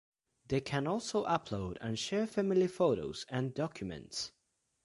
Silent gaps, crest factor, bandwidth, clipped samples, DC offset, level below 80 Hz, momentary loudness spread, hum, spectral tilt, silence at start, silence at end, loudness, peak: none; 20 dB; 11.5 kHz; under 0.1%; under 0.1%; -62 dBFS; 10 LU; none; -5.5 dB/octave; 0.5 s; 0.55 s; -35 LUFS; -16 dBFS